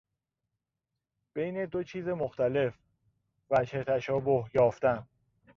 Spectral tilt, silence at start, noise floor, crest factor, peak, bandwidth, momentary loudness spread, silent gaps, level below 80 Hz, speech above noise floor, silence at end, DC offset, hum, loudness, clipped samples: -7.5 dB/octave; 1.35 s; -87 dBFS; 18 dB; -14 dBFS; 7.2 kHz; 9 LU; none; -64 dBFS; 58 dB; 0.55 s; under 0.1%; none; -30 LUFS; under 0.1%